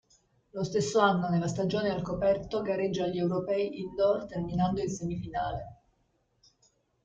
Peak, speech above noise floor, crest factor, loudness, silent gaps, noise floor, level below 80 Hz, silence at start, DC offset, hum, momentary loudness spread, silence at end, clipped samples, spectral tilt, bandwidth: -10 dBFS; 44 dB; 20 dB; -30 LUFS; none; -73 dBFS; -56 dBFS; 0.55 s; under 0.1%; none; 9 LU; 1.3 s; under 0.1%; -6 dB/octave; 8.8 kHz